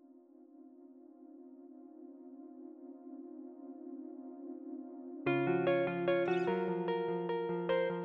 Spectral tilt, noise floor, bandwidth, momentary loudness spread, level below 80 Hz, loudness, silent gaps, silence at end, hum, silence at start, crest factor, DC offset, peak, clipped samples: -5.5 dB/octave; -60 dBFS; 5.8 kHz; 23 LU; -78 dBFS; -35 LUFS; none; 0 s; none; 0.1 s; 18 dB; under 0.1%; -20 dBFS; under 0.1%